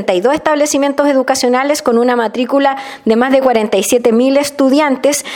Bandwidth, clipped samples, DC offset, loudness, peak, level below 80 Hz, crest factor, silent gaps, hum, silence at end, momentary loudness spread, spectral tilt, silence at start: 17.5 kHz; under 0.1%; under 0.1%; -12 LUFS; 0 dBFS; -54 dBFS; 12 dB; none; none; 0 s; 3 LU; -3.5 dB/octave; 0 s